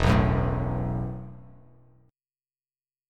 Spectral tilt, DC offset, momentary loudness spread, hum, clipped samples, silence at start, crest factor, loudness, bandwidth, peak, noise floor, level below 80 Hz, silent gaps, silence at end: -7.5 dB/octave; under 0.1%; 21 LU; none; under 0.1%; 0 s; 22 dB; -27 LUFS; 10.5 kHz; -6 dBFS; under -90 dBFS; -36 dBFS; none; 1.65 s